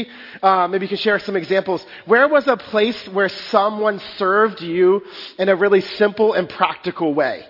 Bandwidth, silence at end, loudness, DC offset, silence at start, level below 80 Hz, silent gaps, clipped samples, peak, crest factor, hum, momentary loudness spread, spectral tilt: 5.8 kHz; 0.05 s; -18 LUFS; under 0.1%; 0 s; -64 dBFS; none; under 0.1%; 0 dBFS; 18 dB; none; 7 LU; -6.5 dB/octave